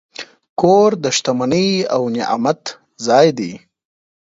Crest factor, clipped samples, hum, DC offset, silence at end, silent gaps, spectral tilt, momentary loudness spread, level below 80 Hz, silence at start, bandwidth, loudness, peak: 16 dB; under 0.1%; none; under 0.1%; 0.75 s; 0.49-0.56 s; -4.5 dB/octave; 15 LU; -58 dBFS; 0.2 s; 8 kHz; -16 LUFS; 0 dBFS